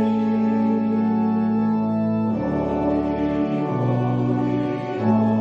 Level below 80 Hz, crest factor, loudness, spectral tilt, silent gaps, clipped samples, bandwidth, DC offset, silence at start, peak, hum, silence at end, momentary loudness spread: -46 dBFS; 12 dB; -21 LUFS; -10 dB/octave; none; under 0.1%; 5.6 kHz; under 0.1%; 0 s; -8 dBFS; none; 0 s; 3 LU